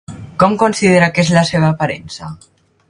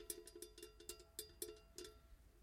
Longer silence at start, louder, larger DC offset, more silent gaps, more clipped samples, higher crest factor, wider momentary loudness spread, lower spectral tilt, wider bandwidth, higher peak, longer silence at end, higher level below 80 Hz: about the same, 0.1 s vs 0 s; first, -13 LUFS vs -54 LUFS; neither; neither; neither; second, 14 dB vs 26 dB; first, 18 LU vs 8 LU; first, -5.5 dB/octave vs -2 dB/octave; second, 11 kHz vs 16.5 kHz; first, 0 dBFS vs -30 dBFS; first, 0.55 s vs 0 s; first, -46 dBFS vs -68 dBFS